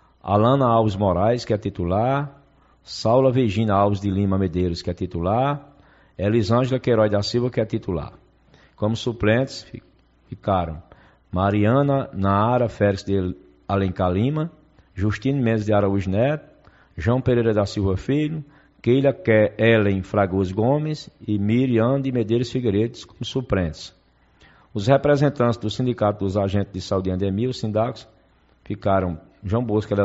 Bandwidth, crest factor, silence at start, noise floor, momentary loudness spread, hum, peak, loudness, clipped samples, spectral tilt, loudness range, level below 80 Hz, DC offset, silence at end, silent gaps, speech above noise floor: 8 kHz; 18 dB; 0.25 s; -58 dBFS; 11 LU; none; -4 dBFS; -22 LUFS; under 0.1%; -6.5 dB/octave; 4 LU; -46 dBFS; under 0.1%; 0 s; none; 37 dB